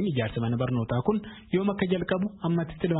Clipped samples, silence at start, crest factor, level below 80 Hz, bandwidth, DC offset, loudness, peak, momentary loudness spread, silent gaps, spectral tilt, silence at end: under 0.1%; 0 s; 16 dB; -52 dBFS; 4.1 kHz; under 0.1%; -28 LUFS; -12 dBFS; 2 LU; none; -11.5 dB/octave; 0 s